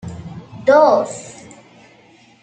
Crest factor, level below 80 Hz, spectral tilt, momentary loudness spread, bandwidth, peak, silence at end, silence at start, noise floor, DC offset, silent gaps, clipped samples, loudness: 18 dB; -56 dBFS; -5 dB/octave; 23 LU; 9.2 kHz; -2 dBFS; 1.1 s; 0.05 s; -49 dBFS; under 0.1%; none; under 0.1%; -14 LUFS